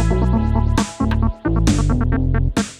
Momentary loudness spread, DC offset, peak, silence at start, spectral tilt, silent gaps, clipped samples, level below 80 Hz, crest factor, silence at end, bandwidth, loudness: 3 LU; under 0.1%; -2 dBFS; 0 s; -6.5 dB/octave; none; under 0.1%; -20 dBFS; 14 dB; 0.05 s; 12.5 kHz; -18 LUFS